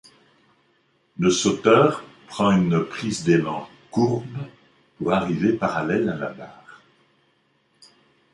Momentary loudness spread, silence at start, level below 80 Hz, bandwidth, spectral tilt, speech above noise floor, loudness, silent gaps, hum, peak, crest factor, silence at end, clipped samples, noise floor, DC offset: 18 LU; 1.2 s; -56 dBFS; 11.5 kHz; -5.5 dB/octave; 44 dB; -22 LUFS; none; none; -4 dBFS; 20 dB; 1.8 s; under 0.1%; -65 dBFS; under 0.1%